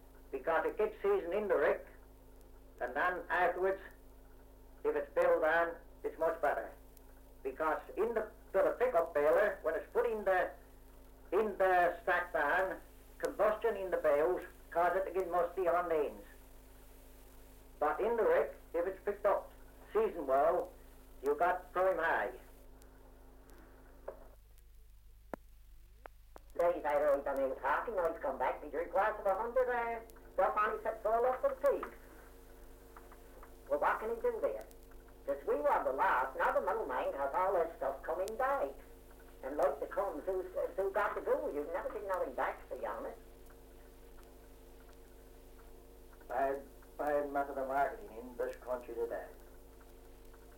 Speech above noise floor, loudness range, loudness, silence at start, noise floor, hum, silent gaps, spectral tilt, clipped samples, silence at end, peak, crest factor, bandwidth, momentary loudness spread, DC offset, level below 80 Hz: 24 dB; 7 LU; -35 LUFS; 0 s; -58 dBFS; none; none; -5.5 dB/octave; under 0.1%; 0 s; -20 dBFS; 16 dB; 17 kHz; 13 LU; under 0.1%; -58 dBFS